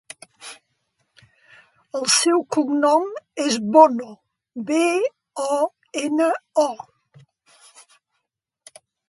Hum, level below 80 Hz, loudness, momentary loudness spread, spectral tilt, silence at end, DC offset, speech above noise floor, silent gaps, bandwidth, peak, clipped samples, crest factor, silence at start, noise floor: none; -74 dBFS; -20 LUFS; 23 LU; -2.5 dB/octave; 2.35 s; under 0.1%; 60 dB; none; 11.5 kHz; 0 dBFS; under 0.1%; 22 dB; 0.4 s; -79 dBFS